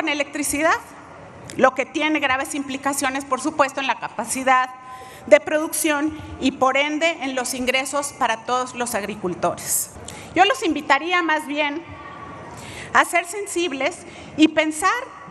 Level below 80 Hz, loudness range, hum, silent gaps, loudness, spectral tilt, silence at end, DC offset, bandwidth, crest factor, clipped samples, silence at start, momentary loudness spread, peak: -54 dBFS; 2 LU; none; none; -21 LUFS; -2.5 dB/octave; 0 s; under 0.1%; 13 kHz; 22 dB; under 0.1%; 0 s; 18 LU; 0 dBFS